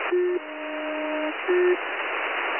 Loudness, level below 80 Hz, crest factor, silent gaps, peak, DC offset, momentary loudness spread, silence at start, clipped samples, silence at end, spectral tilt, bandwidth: -26 LUFS; -76 dBFS; 14 dB; none; -12 dBFS; 0.1%; 8 LU; 0 s; under 0.1%; 0 s; -7 dB/octave; 3.2 kHz